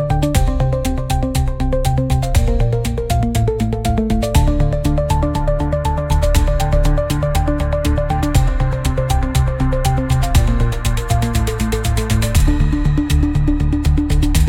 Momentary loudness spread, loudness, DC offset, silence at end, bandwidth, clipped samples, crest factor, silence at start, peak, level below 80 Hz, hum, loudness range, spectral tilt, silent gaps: 3 LU; -17 LUFS; under 0.1%; 0 s; 16.5 kHz; under 0.1%; 14 dB; 0 s; -2 dBFS; -18 dBFS; none; 1 LU; -6 dB/octave; none